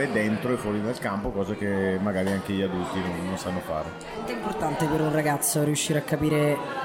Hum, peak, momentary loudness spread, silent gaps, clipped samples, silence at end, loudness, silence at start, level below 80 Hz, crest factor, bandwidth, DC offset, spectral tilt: none; -12 dBFS; 7 LU; none; under 0.1%; 0 s; -26 LUFS; 0 s; -50 dBFS; 14 dB; 16.5 kHz; under 0.1%; -5 dB/octave